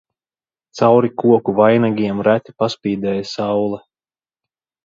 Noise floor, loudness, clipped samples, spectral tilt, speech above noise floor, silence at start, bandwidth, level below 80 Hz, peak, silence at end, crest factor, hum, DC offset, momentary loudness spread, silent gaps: under -90 dBFS; -16 LUFS; under 0.1%; -7 dB/octave; over 74 dB; 0.75 s; 7.6 kHz; -58 dBFS; 0 dBFS; 1.05 s; 16 dB; none; under 0.1%; 8 LU; none